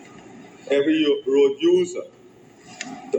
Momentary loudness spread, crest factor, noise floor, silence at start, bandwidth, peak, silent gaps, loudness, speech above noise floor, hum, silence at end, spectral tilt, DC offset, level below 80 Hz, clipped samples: 17 LU; 14 dB; -49 dBFS; 0.35 s; 8.6 kHz; -8 dBFS; none; -20 LUFS; 30 dB; none; 0 s; -4.5 dB/octave; under 0.1%; -70 dBFS; under 0.1%